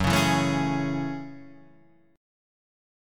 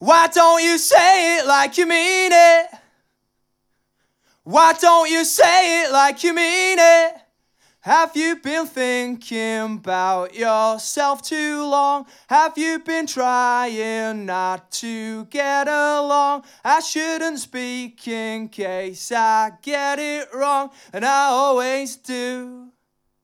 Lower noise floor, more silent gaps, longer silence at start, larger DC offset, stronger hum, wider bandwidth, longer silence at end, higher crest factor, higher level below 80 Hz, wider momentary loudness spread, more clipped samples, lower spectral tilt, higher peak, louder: second, -58 dBFS vs -71 dBFS; neither; about the same, 0 s vs 0 s; neither; neither; about the same, 17.5 kHz vs 17 kHz; first, 0.95 s vs 0.6 s; about the same, 18 dB vs 18 dB; first, -48 dBFS vs -74 dBFS; first, 20 LU vs 15 LU; neither; first, -5 dB/octave vs -1.5 dB/octave; second, -10 dBFS vs -2 dBFS; second, -26 LUFS vs -17 LUFS